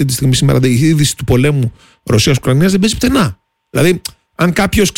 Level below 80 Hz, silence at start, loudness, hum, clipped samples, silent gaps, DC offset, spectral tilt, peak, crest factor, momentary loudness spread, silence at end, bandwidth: -32 dBFS; 0 s; -12 LUFS; none; under 0.1%; none; under 0.1%; -5 dB/octave; -2 dBFS; 10 dB; 8 LU; 0.05 s; 17 kHz